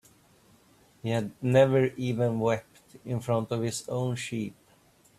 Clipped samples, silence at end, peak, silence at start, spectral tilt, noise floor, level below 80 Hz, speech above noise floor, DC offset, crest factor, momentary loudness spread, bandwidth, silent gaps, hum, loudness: under 0.1%; 0.65 s; -10 dBFS; 1.05 s; -6.5 dB/octave; -61 dBFS; -64 dBFS; 34 dB; under 0.1%; 20 dB; 13 LU; 13.5 kHz; none; none; -28 LUFS